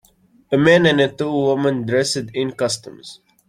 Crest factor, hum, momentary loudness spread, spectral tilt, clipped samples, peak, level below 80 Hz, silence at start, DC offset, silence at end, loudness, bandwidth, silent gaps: 18 dB; none; 12 LU; -5 dB/octave; under 0.1%; -2 dBFS; -56 dBFS; 0.5 s; under 0.1%; 0.35 s; -18 LUFS; 15 kHz; none